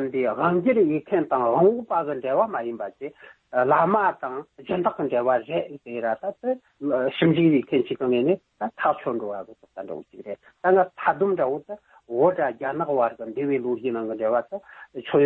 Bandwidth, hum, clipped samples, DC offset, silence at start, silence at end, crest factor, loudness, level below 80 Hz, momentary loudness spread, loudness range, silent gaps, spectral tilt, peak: 4.2 kHz; none; under 0.1%; under 0.1%; 0 s; 0 s; 16 dB; -24 LUFS; -66 dBFS; 17 LU; 3 LU; none; -10 dB/octave; -8 dBFS